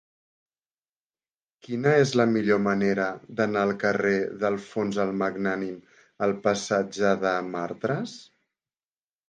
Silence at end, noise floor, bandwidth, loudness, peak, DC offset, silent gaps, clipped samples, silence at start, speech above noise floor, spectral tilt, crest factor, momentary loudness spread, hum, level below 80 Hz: 1.05 s; under -90 dBFS; 9.4 kHz; -25 LUFS; -6 dBFS; under 0.1%; none; under 0.1%; 1.7 s; over 65 dB; -6 dB/octave; 20 dB; 10 LU; none; -66 dBFS